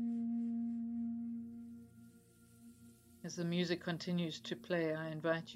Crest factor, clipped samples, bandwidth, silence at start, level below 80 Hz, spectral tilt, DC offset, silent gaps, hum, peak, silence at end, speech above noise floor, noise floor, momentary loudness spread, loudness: 18 dB; under 0.1%; 14 kHz; 0 s; -82 dBFS; -6 dB/octave; under 0.1%; none; none; -24 dBFS; 0 s; 25 dB; -64 dBFS; 18 LU; -40 LUFS